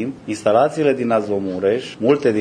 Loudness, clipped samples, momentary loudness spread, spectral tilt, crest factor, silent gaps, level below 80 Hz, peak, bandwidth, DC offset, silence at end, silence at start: -18 LUFS; under 0.1%; 6 LU; -6 dB/octave; 16 dB; none; -60 dBFS; -2 dBFS; 10.5 kHz; under 0.1%; 0 s; 0 s